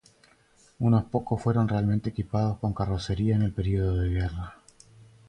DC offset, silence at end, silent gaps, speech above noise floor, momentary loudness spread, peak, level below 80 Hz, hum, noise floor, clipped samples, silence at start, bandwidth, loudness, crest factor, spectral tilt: under 0.1%; 0.75 s; none; 35 dB; 6 LU; -12 dBFS; -40 dBFS; none; -61 dBFS; under 0.1%; 0.8 s; 9.4 kHz; -27 LUFS; 16 dB; -8.5 dB/octave